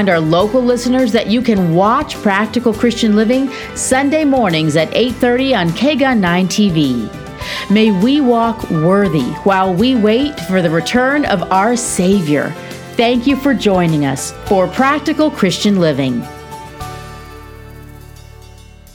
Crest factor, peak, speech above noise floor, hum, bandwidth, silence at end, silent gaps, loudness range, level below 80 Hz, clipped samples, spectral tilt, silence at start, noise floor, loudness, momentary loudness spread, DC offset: 14 dB; 0 dBFS; 25 dB; none; 18.5 kHz; 0.9 s; none; 3 LU; -40 dBFS; under 0.1%; -5 dB/octave; 0 s; -37 dBFS; -13 LUFS; 10 LU; under 0.1%